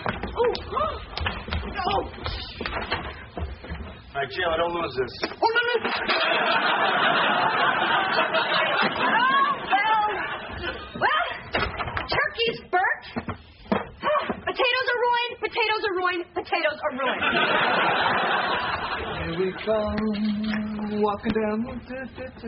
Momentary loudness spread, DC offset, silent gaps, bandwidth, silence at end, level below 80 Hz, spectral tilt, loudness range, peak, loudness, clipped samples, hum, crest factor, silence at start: 11 LU; under 0.1%; none; 5.8 kHz; 0 s; -44 dBFS; -1.5 dB/octave; 7 LU; -8 dBFS; -24 LUFS; under 0.1%; none; 18 dB; 0 s